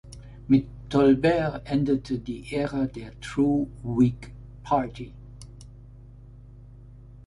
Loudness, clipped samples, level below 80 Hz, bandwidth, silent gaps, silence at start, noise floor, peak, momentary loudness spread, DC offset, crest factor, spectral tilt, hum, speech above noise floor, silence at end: -25 LUFS; under 0.1%; -46 dBFS; 11 kHz; none; 0.05 s; -46 dBFS; -8 dBFS; 23 LU; under 0.1%; 18 dB; -7.5 dB/octave; 50 Hz at -45 dBFS; 22 dB; 0.1 s